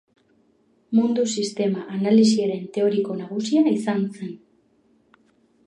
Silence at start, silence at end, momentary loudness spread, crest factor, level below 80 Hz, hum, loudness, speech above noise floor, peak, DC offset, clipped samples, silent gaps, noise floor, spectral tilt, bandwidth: 0.9 s; 1.3 s; 11 LU; 16 dB; -74 dBFS; none; -22 LUFS; 41 dB; -6 dBFS; under 0.1%; under 0.1%; none; -62 dBFS; -5.5 dB/octave; 10.5 kHz